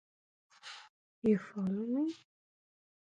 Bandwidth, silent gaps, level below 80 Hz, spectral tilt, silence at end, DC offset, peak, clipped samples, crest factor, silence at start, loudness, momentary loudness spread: 9 kHz; 0.89-1.22 s; -76 dBFS; -7.5 dB/octave; 0.95 s; under 0.1%; -18 dBFS; under 0.1%; 20 dB; 0.65 s; -35 LUFS; 20 LU